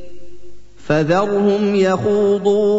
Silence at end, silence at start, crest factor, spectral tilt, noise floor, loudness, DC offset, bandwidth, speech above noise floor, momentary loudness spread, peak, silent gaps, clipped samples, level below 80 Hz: 0 s; 0 s; 14 dB; -7 dB/octave; -40 dBFS; -16 LUFS; under 0.1%; 8 kHz; 25 dB; 2 LU; -2 dBFS; none; under 0.1%; -50 dBFS